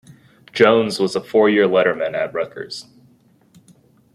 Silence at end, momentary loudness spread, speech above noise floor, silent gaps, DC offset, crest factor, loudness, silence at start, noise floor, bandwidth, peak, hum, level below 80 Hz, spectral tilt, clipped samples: 1.3 s; 17 LU; 37 dB; none; under 0.1%; 18 dB; -17 LUFS; 0.55 s; -54 dBFS; 12.5 kHz; -2 dBFS; none; -64 dBFS; -5 dB/octave; under 0.1%